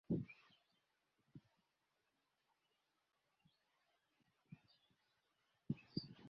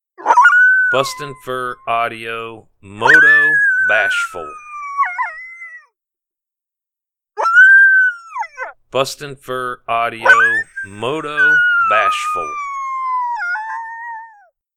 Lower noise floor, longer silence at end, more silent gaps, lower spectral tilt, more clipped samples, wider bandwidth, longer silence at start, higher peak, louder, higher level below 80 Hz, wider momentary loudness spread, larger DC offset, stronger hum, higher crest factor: about the same, -87 dBFS vs -86 dBFS; second, 0 s vs 0.5 s; neither; first, -7 dB/octave vs -2.5 dB/octave; neither; second, 6.4 kHz vs 14.5 kHz; about the same, 0.1 s vs 0.2 s; second, -30 dBFS vs 0 dBFS; second, -49 LUFS vs -13 LUFS; second, -78 dBFS vs -58 dBFS; about the same, 21 LU vs 20 LU; neither; neither; first, 26 dB vs 16 dB